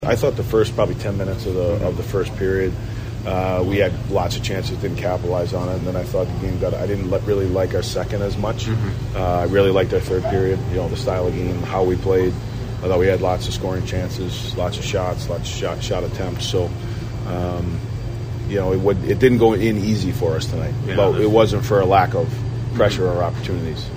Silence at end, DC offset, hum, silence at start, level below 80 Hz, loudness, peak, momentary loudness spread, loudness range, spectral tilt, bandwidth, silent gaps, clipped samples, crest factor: 0 s; under 0.1%; none; 0 s; -34 dBFS; -20 LUFS; 0 dBFS; 9 LU; 5 LU; -6.5 dB/octave; 15.5 kHz; none; under 0.1%; 20 dB